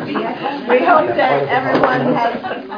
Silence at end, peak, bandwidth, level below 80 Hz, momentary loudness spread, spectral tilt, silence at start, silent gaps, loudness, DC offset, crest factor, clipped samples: 0 s; 0 dBFS; 5.2 kHz; -56 dBFS; 9 LU; -7.5 dB/octave; 0 s; none; -15 LUFS; under 0.1%; 16 dB; under 0.1%